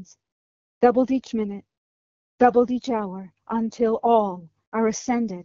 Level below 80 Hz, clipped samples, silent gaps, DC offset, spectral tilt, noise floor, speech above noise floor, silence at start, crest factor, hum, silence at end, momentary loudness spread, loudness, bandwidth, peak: -60 dBFS; under 0.1%; 0.32-0.81 s, 1.77-2.38 s, 4.67-4.72 s; under 0.1%; -5.5 dB/octave; under -90 dBFS; over 68 dB; 0 s; 20 dB; none; 0 s; 13 LU; -23 LUFS; 7.6 kHz; -2 dBFS